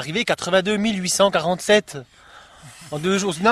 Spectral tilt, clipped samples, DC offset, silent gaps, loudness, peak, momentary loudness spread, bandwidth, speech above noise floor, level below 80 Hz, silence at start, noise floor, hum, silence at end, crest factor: -3.5 dB/octave; under 0.1%; under 0.1%; none; -20 LUFS; -2 dBFS; 12 LU; 13.5 kHz; 24 dB; -56 dBFS; 0 s; -44 dBFS; none; 0 s; 18 dB